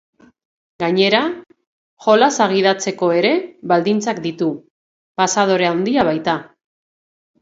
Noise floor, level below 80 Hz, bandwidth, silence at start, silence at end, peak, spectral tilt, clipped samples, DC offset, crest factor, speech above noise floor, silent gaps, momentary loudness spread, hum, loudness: under -90 dBFS; -60 dBFS; 8 kHz; 0.8 s; 0.95 s; 0 dBFS; -4 dB/octave; under 0.1%; under 0.1%; 18 dB; over 74 dB; 1.67-1.97 s, 4.70-5.15 s; 10 LU; none; -17 LUFS